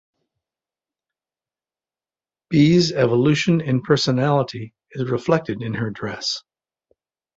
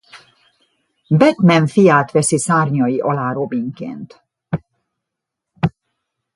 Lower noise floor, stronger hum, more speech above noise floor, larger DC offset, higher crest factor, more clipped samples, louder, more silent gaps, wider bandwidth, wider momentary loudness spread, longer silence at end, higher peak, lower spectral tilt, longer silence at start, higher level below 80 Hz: first, under -90 dBFS vs -81 dBFS; neither; first, over 71 dB vs 66 dB; neither; about the same, 20 dB vs 18 dB; neither; second, -20 LUFS vs -16 LUFS; neither; second, 8 kHz vs 11.5 kHz; about the same, 13 LU vs 15 LU; first, 0.95 s vs 0.65 s; about the same, -2 dBFS vs 0 dBFS; about the same, -6 dB/octave vs -6 dB/octave; first, 2.5 s vs 0.15 s; about the same, -56 dBFS vs -52 dBFS